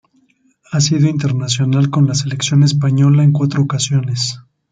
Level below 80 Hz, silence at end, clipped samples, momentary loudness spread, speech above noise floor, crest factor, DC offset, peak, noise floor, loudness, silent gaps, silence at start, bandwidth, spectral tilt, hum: -52 dBFS; 0.3 s; under 0.1%; 7 LU; 43 dB; 12 dB; under 0.1%; -2 dBFS; -57 dBFS; -15 LUFS; none; 0.7 s; 9.4 kHz; -5.5 dB/octave; none